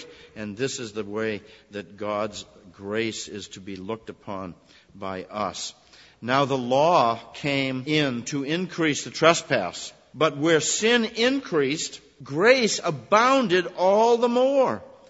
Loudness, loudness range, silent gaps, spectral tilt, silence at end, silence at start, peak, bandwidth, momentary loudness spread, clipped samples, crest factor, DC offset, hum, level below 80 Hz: -23 LUFS; 11 LU; none; -4 dB/octave; 0.25 s; 0 s; -2 dBFS; 8 kHz; 18 LU; under 0.1%; 22 dB; under 0.1%; none; -64 dBFS